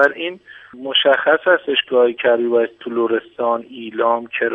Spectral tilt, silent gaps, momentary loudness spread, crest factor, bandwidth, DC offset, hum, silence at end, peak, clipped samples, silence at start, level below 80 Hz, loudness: -5 dB/octave; none; 12 LU; 18 dB; 5.2 kHz; under 0.1%; none; 0 s; 0 dBFS; under 0.1%; 0 s; -70 dBFS; -17 LUFS